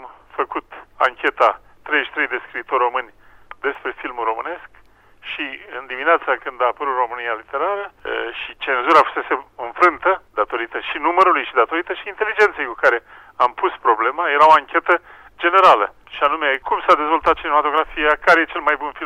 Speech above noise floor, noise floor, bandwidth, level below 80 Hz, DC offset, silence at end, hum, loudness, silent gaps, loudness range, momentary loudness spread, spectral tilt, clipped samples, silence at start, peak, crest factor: 31 dB; -49 dBFS; 14 kHz; -52 dBFS; under 0.1%; 0 s; none; -18 LUFS; none; 8 LU; 13 LU; -3.5 dB/octave; under 0.1%; 0 s; -2 dBFS; 16 dB